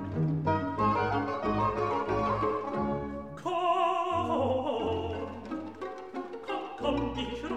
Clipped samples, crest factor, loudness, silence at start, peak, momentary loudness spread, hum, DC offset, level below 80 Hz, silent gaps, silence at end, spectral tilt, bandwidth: under 0.1%; 16 dB; -31 LUFS; 0 s; -16 dBFS; 11 LU; none; 0.1%; -50 dBFS; none; 0 s; -7.5 dB/octave; 10.5 kHz